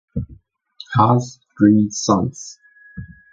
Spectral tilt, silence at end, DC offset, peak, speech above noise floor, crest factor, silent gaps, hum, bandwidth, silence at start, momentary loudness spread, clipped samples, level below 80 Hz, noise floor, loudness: -6 dB/octave; 0.25 s; under 0.1%; 0 dBFS; 31 dB; 20 dB; none; none; 7.8 kHz; 0.15 s; 23 LU; under 0.1%; -44 dBFS; -47 dBFS; -17 LUFS